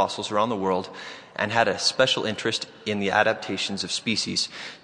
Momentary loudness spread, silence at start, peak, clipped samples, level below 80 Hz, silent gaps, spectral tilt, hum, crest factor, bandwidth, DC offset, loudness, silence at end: 8 LU; 0 s; -4 dBFS; under 0.1%; -68 dBFS; none; -3 dB/octave; none; 22 dB; 11 kHz; under 0.1%; -24 LUFS; 0.05 s